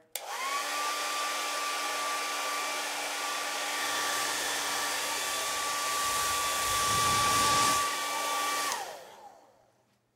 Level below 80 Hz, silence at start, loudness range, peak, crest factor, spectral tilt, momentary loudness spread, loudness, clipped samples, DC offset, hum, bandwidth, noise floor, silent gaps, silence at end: -60 dBFS; 0.15 s; 4 LU; -12 dBFS; 18 dB; -0.5 dB/octave; 7 LU; -29 LUFS; under 0.1%; under 0.1%; none; 16 kHz; -69 dBFS; none; 0.8 s